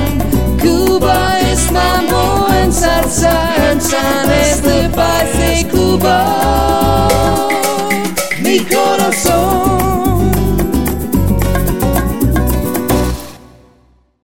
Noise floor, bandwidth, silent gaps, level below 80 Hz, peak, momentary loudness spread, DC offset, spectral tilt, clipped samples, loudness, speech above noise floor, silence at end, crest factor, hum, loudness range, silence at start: -50 dBFS; 17 kHz; none; -20 dBFS; 0 dBFS; 4 LU; 4%; -4.5 dB/octave; under 0.1%; -12 LUFS; 39 dB; 0 s; 12 dB; none; 2 LU; 0 s